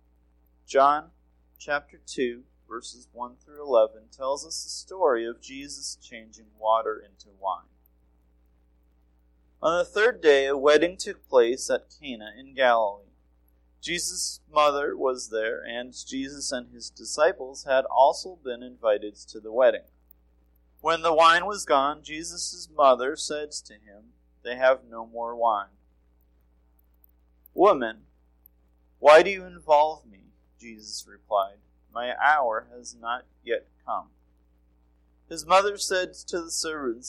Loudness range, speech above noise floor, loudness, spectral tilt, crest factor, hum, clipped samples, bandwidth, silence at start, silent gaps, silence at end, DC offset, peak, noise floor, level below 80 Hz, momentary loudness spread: 7 LU; 37 dB; -25 LUFS; -2 dB/octave; 20 dB; none; under 0.1%; 16 kHz; 0.7 s; none; 0 s; under 0.1%; -6 dBFS; -63 dBFS; -60 dBFS; 18 LU